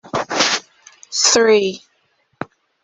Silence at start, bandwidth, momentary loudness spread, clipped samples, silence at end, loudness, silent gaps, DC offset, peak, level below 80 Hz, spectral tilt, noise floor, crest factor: 0.05 s; 8.4 kHz; 21 LU; under 0.1%; 0.4 s; -15 LUFS; none; under 0.1%; 0 dBFS; -60 dBFS; -1 dB/octave; -63 dBFS; 18 dB